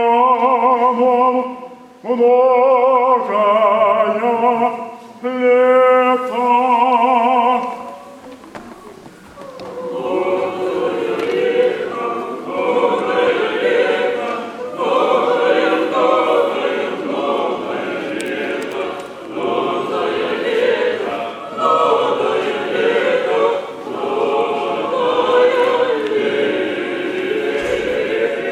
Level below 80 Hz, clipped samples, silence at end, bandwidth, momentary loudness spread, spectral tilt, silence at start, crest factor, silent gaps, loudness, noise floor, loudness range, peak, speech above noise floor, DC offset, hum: -60 dBFS; under 0.1%; 0 s; 11 kHz; 13 LU; -5 dB/octave; 0 s; 14 dB; none; -16 LUFS; -38 dBFS; 7 LU; -2 dBFS; 26 dB; under 0.1%; none